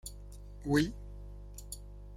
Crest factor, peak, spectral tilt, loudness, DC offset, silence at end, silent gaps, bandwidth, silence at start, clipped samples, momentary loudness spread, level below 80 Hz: 22 dB; -14 dBFS; -5.5 dB/octave; -35 LUFS; under 0.1%; 0 s; none; 16 kHz; 0.05 s; under 0.1%; 19 LU; -48 dBFS